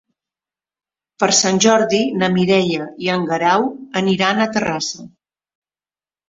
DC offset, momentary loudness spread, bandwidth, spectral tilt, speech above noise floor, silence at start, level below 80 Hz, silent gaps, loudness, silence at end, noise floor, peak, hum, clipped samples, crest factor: under 0.1%; 8 LU; 7.8 kHz; -3.5 dB/octave; over 73 dB; 1.2 s; -58 dBFS; none; -16 LUFS; 1.2 s; under -90 dBFS; 0 dBFS; none; under 0.1%; 18 dB